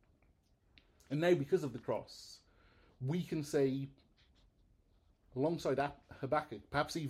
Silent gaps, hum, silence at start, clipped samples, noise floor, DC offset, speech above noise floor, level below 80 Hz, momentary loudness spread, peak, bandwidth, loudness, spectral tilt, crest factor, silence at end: none; none; 1.1 s; under 0.1%; -72 dBFS; under 0.1%; 35 dB; -66 dBFS; 15 LU; -18 dBFS; 15 kHz; -37 LUFS; -6.5 dB/octave; 20 dB; 0 s